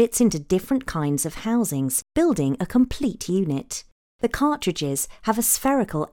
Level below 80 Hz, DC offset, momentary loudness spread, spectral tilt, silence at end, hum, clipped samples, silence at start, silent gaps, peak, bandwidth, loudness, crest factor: -44 dBFS; under 0.1%; 7 LU; -4.5 dB/octave; 0.05 s; none; under 0.1%; 0 s; 3.92-4.19 s; -6 dBFS; 18 kHz; -23 LUFS; 18 dB